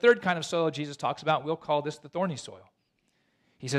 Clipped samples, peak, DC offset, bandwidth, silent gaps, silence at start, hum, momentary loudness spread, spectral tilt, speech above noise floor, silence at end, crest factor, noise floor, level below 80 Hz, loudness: under 0.1%; -10 dBFS; under 0.1%; 11.5 kHz; none; 0.05 s; none; 11 LU; -5 dB/octave; 46 dB; 0 s; 18 dB; -74 dBFS; -72 dBFS; -29 LUFS